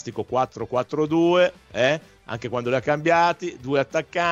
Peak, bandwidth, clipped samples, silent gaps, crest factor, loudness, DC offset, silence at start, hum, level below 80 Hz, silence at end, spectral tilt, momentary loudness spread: -6 dBFS; 7.8 kHz; under 0.1%; none; 16 dB; -22 LUFS; under 0.1%; 0.05 s; none; -58 dBFS; 0 s; -5.5 dB/octave; 10 LU